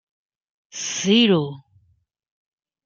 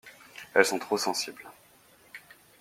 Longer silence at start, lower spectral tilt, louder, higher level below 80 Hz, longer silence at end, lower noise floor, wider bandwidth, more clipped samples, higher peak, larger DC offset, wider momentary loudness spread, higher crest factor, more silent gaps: first, 0.75 s vs 0.05 s; first, -4 dB/octave vs -2 dB/octave; first, -19 LUFS vs -27 LUFS; first, -70 dBFS vs -76 dBFS; first, 1.25 s vs 0.45 s; first, -64 dBFS vs -59 dBFS; second, 7.6 kHz vs 16.5 kHz; neither; about the same, -4 dBFS vs -4 dBFS; neither; second, 16 LU vs 24 LU; second, 20 dB vs 28 dB; neither